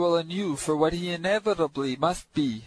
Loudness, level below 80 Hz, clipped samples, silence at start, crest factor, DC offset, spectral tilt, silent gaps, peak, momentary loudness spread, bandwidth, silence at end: -27 LUFS; -52 dBFS; under 0.1%; 0 s; 16 dB; under 0.1%; -5 dB/octave; none; -10 dBFS; 4 LU; 11 kHz; 0 s